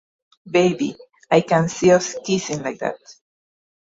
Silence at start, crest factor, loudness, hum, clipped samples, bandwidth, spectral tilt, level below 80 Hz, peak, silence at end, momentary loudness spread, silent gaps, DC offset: 0.45 s; 18 dB; -20 LUFS; none; under 0.1%; 8 kHz; -5 dB/octave; -60 dBFS; -2 dBFS; 0.7 s; 11 LU; none; under 0.1%